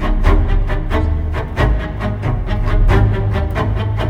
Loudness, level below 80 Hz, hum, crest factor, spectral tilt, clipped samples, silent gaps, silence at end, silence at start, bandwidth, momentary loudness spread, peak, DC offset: -18 LUFS; -16 dBFS; none; 14 dB; -8 dB/octave; under 0.1%; none; 0 s; 0 s; 6.6 kHz; 6 LU; 0 dBFS; under 0.1%